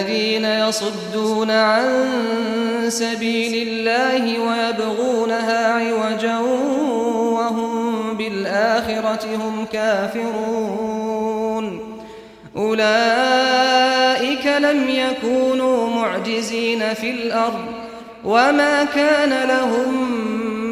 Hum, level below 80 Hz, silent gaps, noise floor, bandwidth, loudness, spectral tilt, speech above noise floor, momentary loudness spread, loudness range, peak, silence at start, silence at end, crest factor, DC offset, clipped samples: none; -58 dBFS; none; -39 dBFS; 15 kHz; -19 LUFS; -3.5 dB/octave; 21 dB; 8 LU; 4 LU; -4 dBFS; 0 s; 0 s; 16 dB; under 0.1%; under 0.1%